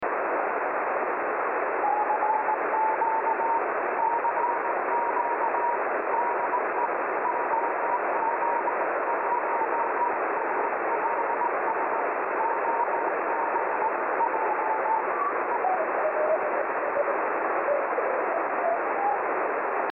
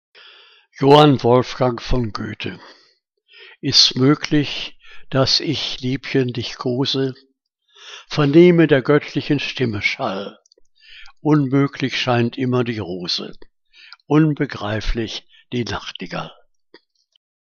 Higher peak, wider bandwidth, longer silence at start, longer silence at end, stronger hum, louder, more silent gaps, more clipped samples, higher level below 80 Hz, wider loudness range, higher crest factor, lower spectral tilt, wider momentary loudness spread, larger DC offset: second, -14 dBFS vs 0 dBFS; second, 3.4 kHz vs 7.4 kHz; second, 0 s vs 0.8 s; second, 0 s vs 1.25 s; neither; second, -26 LUFS vs -18 LUFS; neither; neither; second, -80 dBFS vs -38 dBFS; second, 1 LU vs 5 LU; second, 12 dB vs 20 dB; second, -3.5 dB/octave vs -5.5 dB/octave; second, 2 LU vs 17 LU; neither